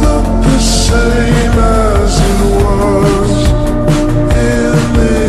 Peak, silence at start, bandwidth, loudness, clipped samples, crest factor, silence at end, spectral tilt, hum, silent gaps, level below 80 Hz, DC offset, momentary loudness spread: 0 dBFS; 0 s; 13 kHz; -11 LUFS; under 0.1%; 8 dB; 0 s; -5.5 dB/octave; none; none; -14 dBFS; under 0.1%; 2 LU